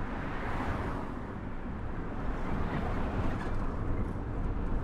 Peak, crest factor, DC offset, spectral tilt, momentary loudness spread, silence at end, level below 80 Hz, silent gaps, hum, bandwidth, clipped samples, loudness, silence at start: -20 dBFS; 14 dB; under 0.1%; -8 dB/octave; 6 LU; 0 s; -36 dBFS; none; none; 7.6 kHz; under 0.1%; -36 LUFS; 0 s